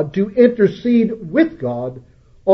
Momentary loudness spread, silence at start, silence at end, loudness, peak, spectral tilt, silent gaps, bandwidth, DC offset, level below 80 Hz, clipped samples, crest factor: 11 LU; 0 s; 0 s; -17 LUFS; 0 dBFS; -9 dB/octave; none; 6 kHz; under 0.1%; -52 dBFS; under 0.1%; 16 dB